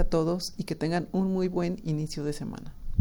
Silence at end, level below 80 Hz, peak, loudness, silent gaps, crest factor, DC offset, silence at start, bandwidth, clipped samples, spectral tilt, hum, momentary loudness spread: 0 s; -38 dBFS; -8 dBFS; -30 LUFS; none; 20 dB; under 0.1%; 0 s; 18 kHz; under 0.1%; -6.5 dB/octave; none; 8 LU